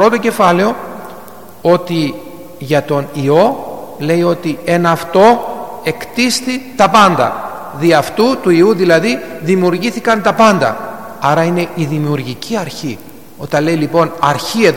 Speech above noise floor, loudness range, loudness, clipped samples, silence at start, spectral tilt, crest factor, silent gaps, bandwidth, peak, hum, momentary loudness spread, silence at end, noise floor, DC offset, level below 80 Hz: 22 dB; 4 LU; -13 LUFS; under 0.1%; 0 s; -5.5 dB/octave; 14 dB; none; 17.5 kHz; 0 dBFS; none; 15 LU; 0 s; -34 dBFS; 1%; -50 dBFS